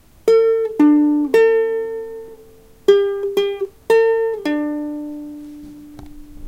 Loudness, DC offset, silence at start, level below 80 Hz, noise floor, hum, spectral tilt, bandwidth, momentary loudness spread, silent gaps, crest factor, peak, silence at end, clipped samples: -17 LUFS; under 0.1%; 0.25 s; -48 dBFS; -45 dBFS; none; -5.5 dB/octave; 15.5 kHz; 19 LU; none; 16 dB; -2 dBFS; 0 s; under 0.1%